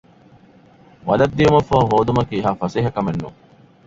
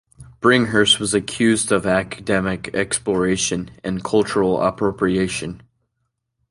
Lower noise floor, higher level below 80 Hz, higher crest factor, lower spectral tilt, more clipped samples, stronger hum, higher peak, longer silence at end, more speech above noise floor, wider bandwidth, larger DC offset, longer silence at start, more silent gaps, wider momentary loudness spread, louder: second, -49 dBFS vs -74 dBFS; about the same, -42 dBFS vs -46 dBFS; about the same, 18 dB vs 18 dB; first, -7.5 dB/octave vs -4 dB/octave; neither; neither; about the same, -2 dBFS vs -2 dBFS; second, 0.55 s vs 0.95 s; second, 32 dB vs 55 dB; second, 7.8 kHz vs 11.5 kHz; neither; first, 1.05 s vs 0.2 s; neither; first, 12 LU vs 8 LU; about the same, -18 LUFS vs -19 LUFS